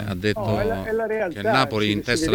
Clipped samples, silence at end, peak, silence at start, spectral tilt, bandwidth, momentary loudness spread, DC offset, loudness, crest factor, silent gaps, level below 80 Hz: under 0.1%; 0 s; -4 dBFS; 0 s; -5 dB/octave; 19 kHz; 5 LU; under 0.1%; -22 LUFS; 18 dB; none; -42 dBFS